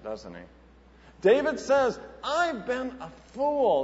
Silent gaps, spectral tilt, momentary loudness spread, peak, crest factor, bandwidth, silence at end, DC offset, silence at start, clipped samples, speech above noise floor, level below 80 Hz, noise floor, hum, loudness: none; -4.5 dB/octave; 19 LU; -10 dBFS; 18 dB; 8 kHz; 0 s; under 0.1%; 0.05 s; under 0.1%; 27 dB; -56 dBFS; -54 dBFS; none; -26 LUFS